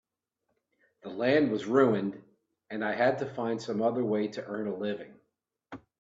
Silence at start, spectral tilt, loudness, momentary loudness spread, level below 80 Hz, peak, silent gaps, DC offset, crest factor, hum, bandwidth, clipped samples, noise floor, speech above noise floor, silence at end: 1.05 s; -7 dB/octave; -29 LUFS; 21 LU; -74 dBFS; -10 dBFS; none; under 0.1%; 20 dB; none; 7.8 kHz; under 0.1%; -82 dBFS; 53 dB; 0.25 s